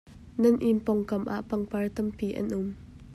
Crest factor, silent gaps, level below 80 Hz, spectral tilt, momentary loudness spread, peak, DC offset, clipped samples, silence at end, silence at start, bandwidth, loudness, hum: 18 dB; none; -54 dBFS; -8 dB/octave; 11 LU; -12 dBFS; under 0.1%; under 0.1%; 0 s; 0.05 s; 13.5 kHz; -28 LUFS; none